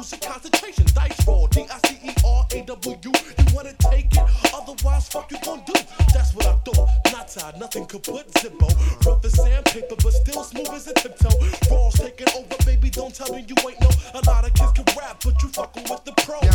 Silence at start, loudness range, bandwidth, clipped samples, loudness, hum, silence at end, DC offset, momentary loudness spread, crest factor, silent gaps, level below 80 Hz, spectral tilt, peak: 0 s; 1 LU; 18 kHz; under 0.1%; -21 LUFS; none; 0 s; under 0.1%; 12 LU; 18 dB; none; -20 dBFS; -5 dB/octave; 0 dBFS